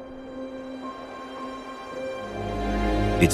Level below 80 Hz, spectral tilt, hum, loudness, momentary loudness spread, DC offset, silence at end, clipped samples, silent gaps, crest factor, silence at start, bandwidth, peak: -36 dBFS; -5.5 dB/octave; none; -30 LUFS; 13 LU; under 0.1%; 0 s; under 0.1%; none; 22 dB; 0 s; 14 kHz; -6 dBFS